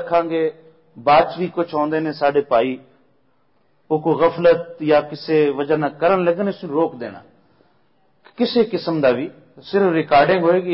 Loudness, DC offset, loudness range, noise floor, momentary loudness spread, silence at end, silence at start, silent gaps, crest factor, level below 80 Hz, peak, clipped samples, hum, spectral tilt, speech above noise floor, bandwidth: -18 LUFS; under 0.1%; 4 LU; -63 dBFS; 9 LU; 0 s; 0 s; none; 14 dB; -58 dBFS; -4 dBFS; under 0.1%; none; -11 dB/octave; 46 dB; 5.8 kHz